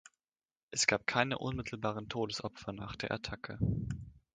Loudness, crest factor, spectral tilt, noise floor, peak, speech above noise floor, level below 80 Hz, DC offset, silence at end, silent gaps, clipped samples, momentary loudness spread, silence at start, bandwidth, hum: -36 LUFS; 26 dB; -4 dB/octave; under -90 dBFS; -10 dBFS; over 54 dB; -54 dBFS; under 0.1%; 0.15 s; none; under 0.1%; 13 LU; 0.7 s; 9.6 kHz; none